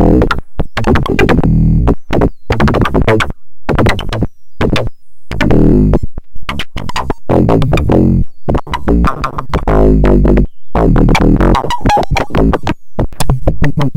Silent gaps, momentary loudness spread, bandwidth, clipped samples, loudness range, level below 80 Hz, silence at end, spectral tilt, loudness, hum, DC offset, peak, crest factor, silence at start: none; 11 LU; 16 kHz; 0.2%; 3 LU; -16 dBFS; 0 s; -7 dB/octave; -12 LUFS; none; under 0.1%; 0 dBFS; 10 dB; 0 s